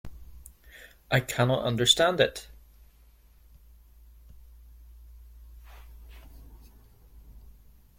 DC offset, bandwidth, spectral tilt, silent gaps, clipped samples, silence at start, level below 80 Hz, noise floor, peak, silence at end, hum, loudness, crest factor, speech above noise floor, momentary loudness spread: under 0.1%; 16.5 kHz; -3.5 dB/octave; none; under 0.1%; 0.05 s; -50 dBFS; -57 dBFS; -6 dBFS; 0.6 s; none; -24 LUFS; 26 dB; 33 dB; 30 LU